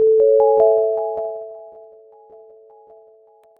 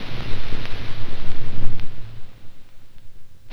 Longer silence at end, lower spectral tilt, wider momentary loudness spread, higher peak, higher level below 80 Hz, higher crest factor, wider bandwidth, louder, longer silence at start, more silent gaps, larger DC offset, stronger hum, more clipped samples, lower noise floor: first, 1.9 s vs 0 s; first, -9.5 dB/octave vs -6 dB/octave; about the same, 21 LU vs 21 LU; second, -4 dBFS vs 0 dBFS; second, -64 dBFS vs -28 dBFS; about the same, 16 dB vs 14 dB; second, 1.7 kHz vs 5.2 kHz; first, -16 LUFS vs -34 LUFS; about the same, 0 s vs 0 s; neither; neither; neither; neither; first, -51 dBFS vs -32 dBFS